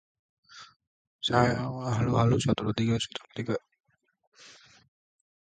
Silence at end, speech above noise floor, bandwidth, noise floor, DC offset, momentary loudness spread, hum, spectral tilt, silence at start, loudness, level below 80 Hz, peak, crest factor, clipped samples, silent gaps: 1.05 s; 28 dB; 9.2 kHz; -54 dBFS; under 0.1%; 13 LU; none; -6 dB/octave; 0.55 s; -28 LUFS; -54 dBFS; -8 dBFS; 22 dB; under 0.1%; 0.76-0.80 s, 0.87-1.19 s, 3.80-3.84 s, 4.27-4.32 s